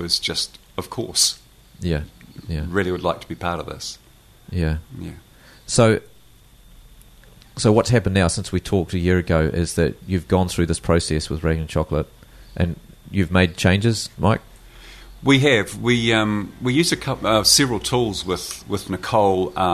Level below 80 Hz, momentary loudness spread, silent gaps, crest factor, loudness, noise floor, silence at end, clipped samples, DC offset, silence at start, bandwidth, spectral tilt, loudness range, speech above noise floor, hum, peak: -38 dBFS; 14 LU; none; 20 dB; -20 LUFS; -50 dBFS; 0 s; under 0.1%; under 0.1%; 0 s; 13.5 kHz; -4.5 dB/octave; 6 LU; 30 dB; none; 0 dBFS